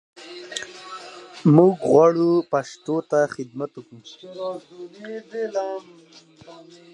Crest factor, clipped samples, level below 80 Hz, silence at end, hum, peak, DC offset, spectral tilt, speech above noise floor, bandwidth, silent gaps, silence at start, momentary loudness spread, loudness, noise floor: 22 dB; under 0.1%; -68 dBFS; 0.4 s; none; -2 dBFS; under 0.1%; -7 dB/octave; 18 dB; 10.5 kHz; none; 0.2 s; 24 LU; -21 LUFS; -40 dBFS